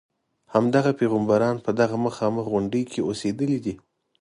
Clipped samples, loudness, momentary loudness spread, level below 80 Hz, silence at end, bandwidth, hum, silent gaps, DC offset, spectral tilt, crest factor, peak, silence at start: under 0.1%; -24 LUFS; 6 LU; -60 dBFS; 0.45 s; 11 kHz; none; none; under 0.1%; -7 dB/octave; 18 dB; -4 dBFS; 0.5 s